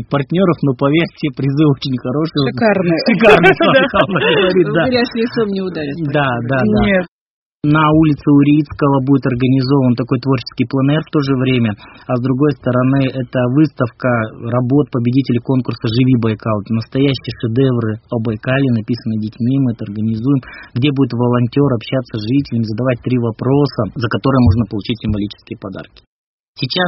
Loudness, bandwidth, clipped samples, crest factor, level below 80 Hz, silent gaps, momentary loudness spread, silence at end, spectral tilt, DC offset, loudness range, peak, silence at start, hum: -15 LUFS; 6 kHz; under 0.1%; 14 dB; -40 dBFS; 7.08-7.60 s, 26.07-26.54 s; 8 LU; 0 s; -6 dB/octave; under 0.1%; 5 LU; 0 dBFS; 0 s; none